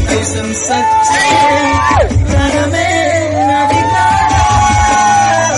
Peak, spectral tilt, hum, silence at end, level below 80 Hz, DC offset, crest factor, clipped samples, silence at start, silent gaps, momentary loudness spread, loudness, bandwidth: -2 dBFS; -4 dB/octave; none; 0 s; -24 dBFS; under 0.1%; 10 dB; under 0.1%; 0 s; none; 4 LU; -10 LUFS; 11.5 kHz